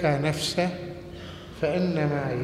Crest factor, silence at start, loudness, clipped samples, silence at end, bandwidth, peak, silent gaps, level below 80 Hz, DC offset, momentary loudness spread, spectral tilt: 18 dB; 0 s; -27 LUFS; under 0.1%; 0 s; 14 kHz; -10 dBFS; none; -52 dBFS; under 0.1%; 15 LU; -5.5 dB/octave